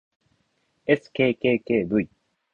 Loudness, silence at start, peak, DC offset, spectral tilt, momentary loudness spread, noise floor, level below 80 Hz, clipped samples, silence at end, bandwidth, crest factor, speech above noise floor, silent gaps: -24 LUFS; 0.9 s; -6 dBFS; under 0.1%; -8 dB/octave; 9 LU; -70 dBFS; -58 dBFS; under 0.1%; 0.5 s; 7.2 kHz; 20 dB; 48 dB; none